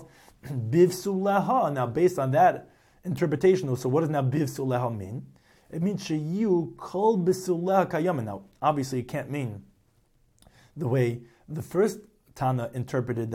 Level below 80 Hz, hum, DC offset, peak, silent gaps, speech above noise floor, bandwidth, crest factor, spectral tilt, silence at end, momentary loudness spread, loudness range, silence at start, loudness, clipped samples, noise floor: -62 dBFS; none; under 0.1%; -10 dBFS; none; 39 dB; 16 kHz; 18 dB; -7 dB/octave; 0 s; 14 LU; 6 LU; 0 s; -26 LUFS; under 0.1%; -65 dBFS